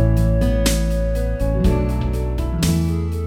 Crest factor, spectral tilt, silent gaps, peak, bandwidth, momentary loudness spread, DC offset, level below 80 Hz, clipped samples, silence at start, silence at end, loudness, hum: 14 dB; -6 dB/octave; none; -4 dBFS; 16 kHz; 5 LU; under 0.1%; -20 dBFS; under 0.1%; 0 s; 0 s; -20 LUFS; none